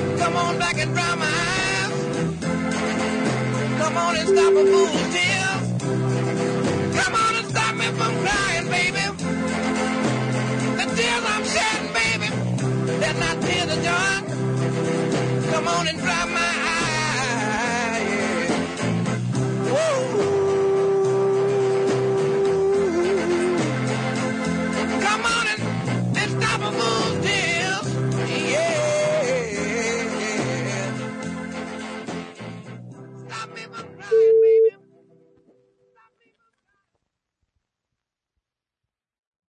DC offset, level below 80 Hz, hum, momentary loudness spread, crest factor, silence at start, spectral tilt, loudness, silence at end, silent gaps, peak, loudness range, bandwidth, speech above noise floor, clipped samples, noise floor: under 0.1%; -52 dBFS; none; 6 LU; 16 dB; 0 s; -4.5 dB/octave; -21 LUFS; 4.85 s; none; -8 dBFS; 4 LU; 11 kHz; 68 dB; under 0.1%; -86 dBFS